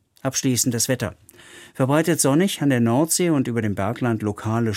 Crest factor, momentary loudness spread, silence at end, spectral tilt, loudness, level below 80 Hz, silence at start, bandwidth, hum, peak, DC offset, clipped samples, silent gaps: 16 dB; 7 LU; 0 s; -4.5 dB/octave; -21 LUFS; -58 dBFS; 0.25 s; 16.5 kHz; none; -6 dBFS; under 0.1%; under 0.1%; none